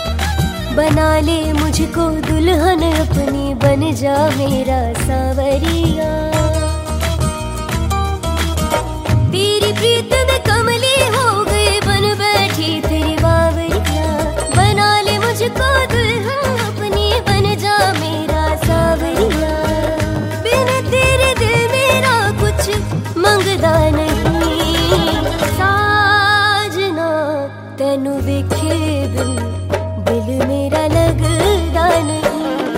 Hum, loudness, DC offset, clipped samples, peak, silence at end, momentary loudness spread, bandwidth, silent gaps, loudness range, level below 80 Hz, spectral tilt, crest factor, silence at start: none; -15 LUFS; under 0.1%; under 0.1%; 0 dBFS; 0 s; 6 LU; 16.5 kHz; none; 4 LU; -24 dBFS; -5 dB/octave; 14 dB; 0 s